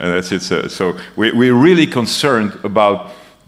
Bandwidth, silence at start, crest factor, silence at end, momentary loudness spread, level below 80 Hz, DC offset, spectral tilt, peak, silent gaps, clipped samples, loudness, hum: 14.5 kHz; 0 s; 14 dB; 0.3 s; 9 LU; -54 dBFS; under 0.1%; -5 dB/octave; 0 dBFS; none; under 0.1%; -14 LUFS; none